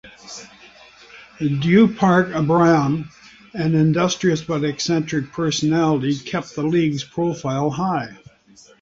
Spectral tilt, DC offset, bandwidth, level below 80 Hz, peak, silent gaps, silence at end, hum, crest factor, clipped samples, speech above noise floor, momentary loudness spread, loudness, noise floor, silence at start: -6 dB/octave; under 0.1%; 7.8 kHz; -54 dBFS; -4 dBFS; none; 0.65 s; none; 16 dB; under 0.1%; 32 dB; 12 LU; -19 LUFS; -50 dBFS; 0.05 s